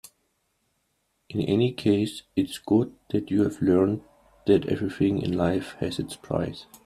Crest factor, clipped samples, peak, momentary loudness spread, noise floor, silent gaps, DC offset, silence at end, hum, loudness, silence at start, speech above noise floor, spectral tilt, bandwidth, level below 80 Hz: 18 dB; under 0.1%; -8 dBFS; 8 LU; -73 dBFS; none; under 0.1%; 0.1 s; none; -26 LUFS; 1.3 s; 49 dB; -7 dB/octave; 14 kHz; -56 dBFS